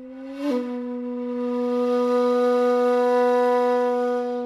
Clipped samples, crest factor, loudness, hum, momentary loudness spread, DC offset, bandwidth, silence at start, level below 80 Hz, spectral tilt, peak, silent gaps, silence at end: under 0.1%; 10 dB; -22 LUFS; none; 10 LU; under 0.1%; 11 kHz; 0 s; -70 dBFS; -5 dB/octave; -12 dBFS; none; 0 s